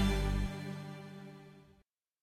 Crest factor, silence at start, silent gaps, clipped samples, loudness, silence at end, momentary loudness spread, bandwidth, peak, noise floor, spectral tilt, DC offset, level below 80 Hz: 18 dB; 0 s; none; under 0.1%; -39 LUFS; 0.6 s; 20 LU; 16 kHz; -20 dBFS; -72 dBFS; -6 dB/octave; under 0.1%; -40 dBFS